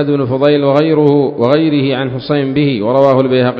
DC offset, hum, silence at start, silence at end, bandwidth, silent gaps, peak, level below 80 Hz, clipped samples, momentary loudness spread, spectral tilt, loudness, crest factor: under 0.1%; none; 0 s; 0 s; 6 kHz; none; 0 dBFS; -50 dBFS; 0.2%; 5 LU; -9 dB/octave; -12 LUFS; 12 dB